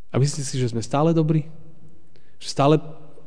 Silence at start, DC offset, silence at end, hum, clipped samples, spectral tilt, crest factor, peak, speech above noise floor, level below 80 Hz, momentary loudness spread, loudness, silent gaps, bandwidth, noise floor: 0.15 s; 3%; 0.3 s; none; under 0.1%; -6.5 dB/octave; 18 dB; -6 dBFS; 33 dB; -58 dBFS; 16 LU; -22 LUFS; none; 10 kHz; -54 dBFS